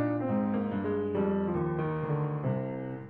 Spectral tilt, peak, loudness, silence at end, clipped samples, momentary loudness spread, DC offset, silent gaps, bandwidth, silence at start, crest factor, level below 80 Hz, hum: -11.5 dB/octave; -18 dBFS; -31 LUFS; 0 s; under 0.1%; 3 LU; under 0.1%; none; 4.1 kHz; 0 s; 12 dB; -58 dBFS; none